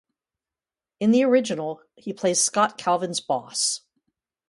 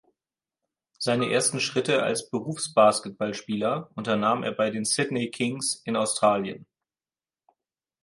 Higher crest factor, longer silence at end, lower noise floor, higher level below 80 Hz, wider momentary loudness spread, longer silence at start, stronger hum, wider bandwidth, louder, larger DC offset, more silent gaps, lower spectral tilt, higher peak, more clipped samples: about the same, 20 dB vs 20 dB; second, 0.7 s vs 1.4 s; about the same, under -90 dBFS vs under -90 dBFS; about the same, -74 dBFS vs -70 dBFS; first, 13 LU vs 10 LU; about the same, 1 s vs 1 s; neither; about the same, 11.5 kHz vs 11.5 kHz; about the same, -23 LUFS vs -25 LUFS; neither; neither; about the same, -3 dB/octave vs -3.5 dB/octave; about the same, -6 dBFS vs -6 dBFS; neither